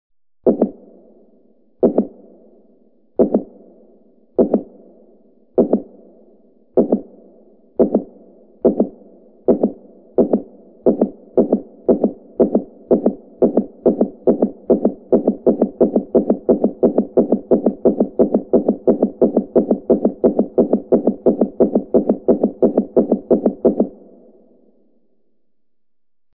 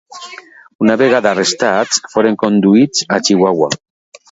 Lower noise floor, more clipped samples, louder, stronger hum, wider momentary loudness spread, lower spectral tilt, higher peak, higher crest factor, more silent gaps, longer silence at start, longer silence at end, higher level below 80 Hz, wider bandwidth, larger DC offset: first, -86 dBFS vs -36 dBFS; neither; second, -18 LUFS vs -13 LUFS; neither; second, 6 LU vs 10 LU; first, -15 dB/octave vs -4 dB/octave; about the same, 0 dBFS vs 0 dBFS; about the same, 18 dB vs 14 dB; second, none vs 0.75-0.79 s; first, 0.45 s vs 0.1 s; first, 2.45 s vs 0.55 s; first, -50 dBFS vs -58 dBFS; second, 2.2 kHz vs 8 kHz; neither